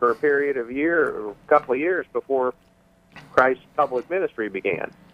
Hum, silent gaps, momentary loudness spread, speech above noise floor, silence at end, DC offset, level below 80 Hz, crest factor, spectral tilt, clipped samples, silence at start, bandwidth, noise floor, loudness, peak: none; none; 7 LU; 27 dB; 0.25 s; under 0.1%; -60 dBFS; 20 dB; -7 dB/octave; under 0.1%; 0 s; 9.4 kHz; -50 dBFS; -23 LUFS; -4 dBFS